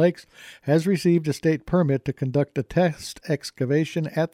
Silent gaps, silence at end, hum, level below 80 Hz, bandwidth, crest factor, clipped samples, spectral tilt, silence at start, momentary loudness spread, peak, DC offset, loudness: none; 0.05 s; none; -54 dBFS; 15 kHz; 14 dB; under 0.1%; -7 dB/octave; 0 s; 8 LU; -8 dBFS; under 0.1%; -23 LUFS